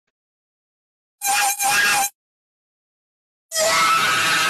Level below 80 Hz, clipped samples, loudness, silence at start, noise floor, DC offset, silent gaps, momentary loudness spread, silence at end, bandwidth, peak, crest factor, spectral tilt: -62 dBFS; under 0.1%; -18 LUFS; 1.2 s; under -90 dBFS; under 0.1%; 2.15-3.49 s; 9 LU; 0 s; 14 kHz; -6 dBFS; 16 dB; 0.5 dB/octave